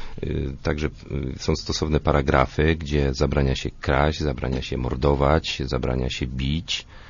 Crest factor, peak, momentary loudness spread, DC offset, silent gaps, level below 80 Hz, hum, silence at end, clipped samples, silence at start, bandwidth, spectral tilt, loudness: 20 dB; -4 dBFS; 8 LU; under 0.1%; none; -30 dBFS; none; 0 s; under 0.1%; 0 s; 7.4 kHz; -6 dB/octave; -24 LUFS